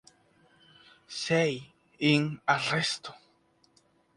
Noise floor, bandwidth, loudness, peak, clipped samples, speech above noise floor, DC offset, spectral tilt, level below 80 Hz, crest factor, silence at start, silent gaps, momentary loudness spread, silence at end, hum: -67 dBFS; 11.5 kHz; -28 LUFS; -10 dBFS; under 0.1%; 39 dB; under 0.1%; -4.5 dB/octave; -72 dBFS; 22 dB; 1.1 s; none; 15 LU; 1 s; none